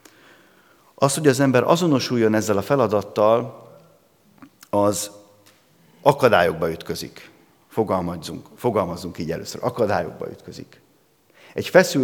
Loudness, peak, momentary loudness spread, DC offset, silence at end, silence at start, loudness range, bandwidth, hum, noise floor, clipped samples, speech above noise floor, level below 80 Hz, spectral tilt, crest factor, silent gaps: -21 LUFS; 0 dBFS; 17 LU; under 0.1%; 0 s; 1 s; 7 LU; 19 kHz; none; -59 dBFS; under 0.1%; 39 dB; -62 dBFS; -5 dB/octave; 22 dB; none